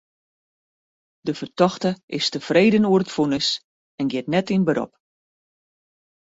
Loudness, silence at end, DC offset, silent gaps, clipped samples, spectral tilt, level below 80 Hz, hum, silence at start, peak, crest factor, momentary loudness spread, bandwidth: -21 LUFS; 1.45 s; under 0.1%; 2.03-2.08 s, 3.64-3.98 s; under 0.1%; -5.5 dB/octave; -62 dBFS; none; 1.25 s; -4 dBFS; 20 dB; 12 LU; 8 kHz